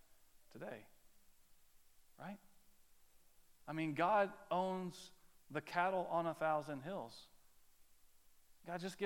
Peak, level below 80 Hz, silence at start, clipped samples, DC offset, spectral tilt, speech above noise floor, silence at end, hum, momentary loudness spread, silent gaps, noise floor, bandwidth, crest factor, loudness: -22 dBFS; -76 dBFS; 0.1 s; under 0.1%; under 0.1%; -6 dB/octave; 26 dB; 0 s; none; 20 LU; none; -66 dBFS; 17.5 kHz; 22 dB; -40 LUFS